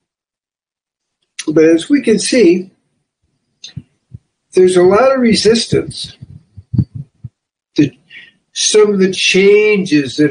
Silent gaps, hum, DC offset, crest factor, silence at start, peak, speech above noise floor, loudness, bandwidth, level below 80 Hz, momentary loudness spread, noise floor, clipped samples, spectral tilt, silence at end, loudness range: none; none; under 0.1%; 14 dB; 1.4 s; 0 dBFS; over 80 dB; -11 LUFS; 10 kHz; -46 dBFS; 17 LU; under -90 dBFS; under 0.1%; -4.5 dB/octave; 0 s; 4 LU